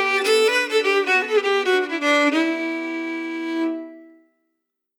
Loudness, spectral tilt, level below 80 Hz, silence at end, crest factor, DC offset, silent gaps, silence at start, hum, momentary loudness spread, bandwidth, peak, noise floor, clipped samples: -20 LUFS; -0.5 dB/octave; under -90 dBFS; 0.95 s; 14 dB; under 0.1%; none; 0 s; none; 10 LU; 18 kHz; -8 dBFS; -77 dBFS; under 0.1%